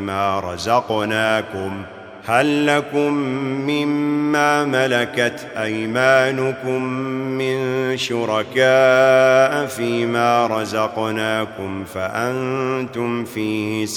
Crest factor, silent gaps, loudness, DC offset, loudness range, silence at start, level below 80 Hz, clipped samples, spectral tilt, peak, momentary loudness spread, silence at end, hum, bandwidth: 18 dB; none; -19 LUFS; under 0.1%; 4 LU; 0 s; -62 dBFS; under 0.1%; -5 dB/octave; 0 dBFS; 10 LU; 0 s; none; 19 kHz